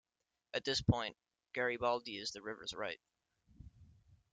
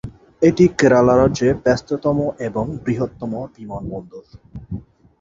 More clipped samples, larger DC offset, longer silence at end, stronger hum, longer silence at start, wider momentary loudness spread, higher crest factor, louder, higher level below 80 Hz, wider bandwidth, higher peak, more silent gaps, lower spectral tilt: neither; neither; second, 0.2 s vs 0.4 s; neither; first, 0.55 s vs 0.05 s; second, 10 LU vs 19 LU; first, 24 dB vs 16 dB; second, -39 LUFS vs -17 LUFS; second, -62 dBFS vs -42 dBFS; first, 9.4 kHz vs 7.8 kHz; second, -18 dBFS vs -2 dBFS; neither; second, -4.5 dB/octave vs -7 dB/octave